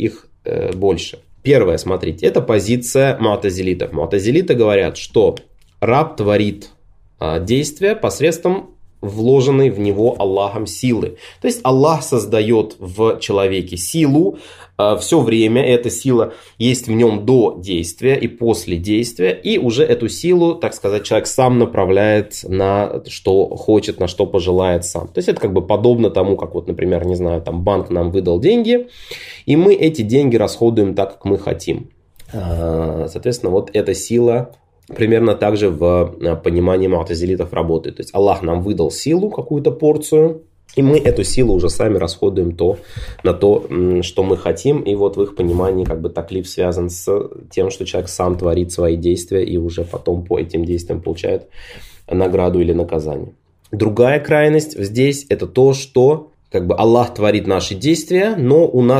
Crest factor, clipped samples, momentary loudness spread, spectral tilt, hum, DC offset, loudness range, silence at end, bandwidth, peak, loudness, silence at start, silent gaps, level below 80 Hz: 16 dB; under 0.1%; 9 LU; -6 dB/octave; none; under 0.1%; 4 LU; 0 s; 15.5 kHz; 0 dBFS; -16 LUFS; 0 s; none; -38 dBFS